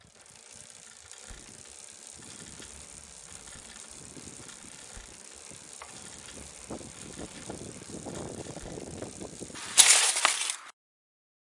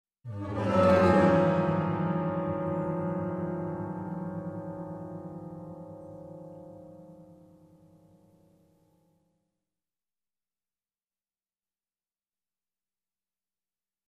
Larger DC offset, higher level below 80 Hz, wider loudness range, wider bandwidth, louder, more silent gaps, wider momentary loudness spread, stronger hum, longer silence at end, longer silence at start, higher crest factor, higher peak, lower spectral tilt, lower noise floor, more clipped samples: neither; about the same, -60 dBFS vs -62 dBFS; second, 20 LU vs 23 LU; first, 11.5 kHz vs 9.6 kHz; first, -23 LUFS vs -28 LUFS; neither; about the same, 22 LU vs 24 LU; neither; second, 0.9 s vs 6.75 s; about the same, 0.15 s vs 0.25 s; first, 34 dB vs 22 dB; first, 0 dBFS vs -10 dBFS; second, 0 dB/octave vs -8.5 dB/octave; second, -54 dBFS vs under -90 dBFS; neither